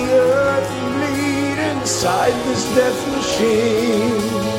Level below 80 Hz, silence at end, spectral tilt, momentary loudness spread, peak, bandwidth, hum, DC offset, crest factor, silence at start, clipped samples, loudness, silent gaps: -46 dBFS; 0 s; -4 dB/octave; 5 LU; -2 dBFS; 16.5 kHz; none; under 0.1%; 14 dB; 0 s; under 0.1%; -17 LUFS; none